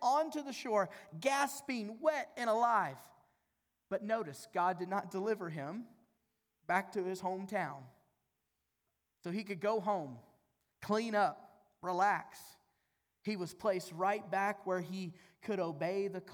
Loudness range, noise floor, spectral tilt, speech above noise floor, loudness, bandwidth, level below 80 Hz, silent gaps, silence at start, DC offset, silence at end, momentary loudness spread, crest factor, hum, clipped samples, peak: 5 LU; -85 dBFS; -5 dB/octave; 49 dB; -37 LUFS; over 20 kHz; -84 dBFS; none; 0 s; under 0.1%; 0 s; 15 LU; 20 dB; none; under 0.1%; -18 dBFS